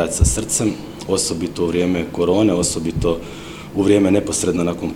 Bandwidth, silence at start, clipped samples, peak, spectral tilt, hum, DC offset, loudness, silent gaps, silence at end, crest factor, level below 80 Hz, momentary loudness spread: 17 kHz; 0 s; under 0.1%; -2 dBFS; -5 dB/octave; none; 0.2%; -18 LUFS; none; 0 s; 16 dB; -30 dBFS; 9 LU